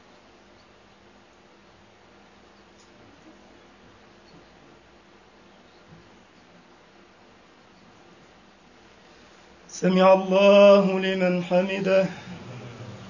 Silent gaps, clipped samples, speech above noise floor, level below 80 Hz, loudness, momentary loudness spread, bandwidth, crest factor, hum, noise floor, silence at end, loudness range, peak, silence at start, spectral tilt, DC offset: none; under 0.1%; 36 dB; -66 dBFS; -19 LUFS; 26 LU; 7.4 kHz; 20 dB; none; -54 dBFS; 0 s; 6 LU; -4 dBFS; 9.75 s; -6 dB/octave; under 0.1%